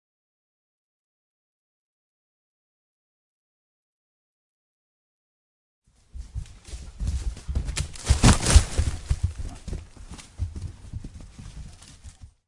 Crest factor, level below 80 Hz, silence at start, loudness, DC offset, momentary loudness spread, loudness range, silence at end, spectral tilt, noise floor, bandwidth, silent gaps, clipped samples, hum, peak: 28 dB; -32 dBFS; 6.15 s; -25 LUFS; under 0.1%; 25 LU; 15 LU; 0.2 s; -4.5 dB/octave; -46 dBFS; 11.5 kHz; none; under 0.1%; none; -2 dBFS